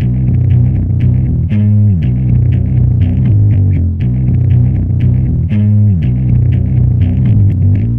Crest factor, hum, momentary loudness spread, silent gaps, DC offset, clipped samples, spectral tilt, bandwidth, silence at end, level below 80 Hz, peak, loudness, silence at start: 8 dB; none; 3 LU; none; 1%; under 0.1%; -12 dB/octave; 3.3 kHz; 0 s; -20 dBFS; 0 dBFS; -11 LUFS; 0 s